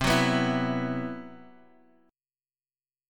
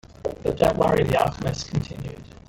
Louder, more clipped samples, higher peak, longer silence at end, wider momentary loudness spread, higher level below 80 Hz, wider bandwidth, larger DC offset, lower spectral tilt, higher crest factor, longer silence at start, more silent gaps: second, -27 LUFS vs -23 LUFS; neither; second, -10 dBFS vs -4 dBFS; first, 1.65 s vs 0.15 s; first, 18 LU vs 14 LU; second, -50 dBFS vs -42 dBFS; about the same, 17 kHz vs 17 kHz; neither; about the same, -5 dB/octave vs -6 dB/octave; about the same, 20 dB vs 18 dB; second, 0 s vs 0.2 s; neither